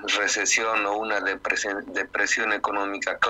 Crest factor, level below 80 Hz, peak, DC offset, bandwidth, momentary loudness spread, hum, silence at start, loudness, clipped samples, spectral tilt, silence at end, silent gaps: 18 dB; -60 dBFS; -8 dBFS; under 0.1%; 16 kHz; 7 LU; none; 0 s; -24 LUFS; under 0.1%; 0 dB/octave; 0 s; none